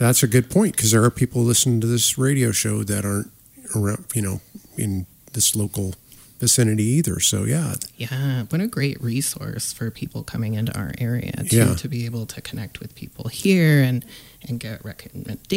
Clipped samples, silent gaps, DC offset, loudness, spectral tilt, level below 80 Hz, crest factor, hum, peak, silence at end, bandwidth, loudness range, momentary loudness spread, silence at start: under 0.1%; none; under 0.1%; -21 LUFS; -4.5 dB/octave; -50 dBFS; 16 dB; none; -6 dBFS; 0 s; 16.5 kHz; 5 LU; 16 LU; 0 s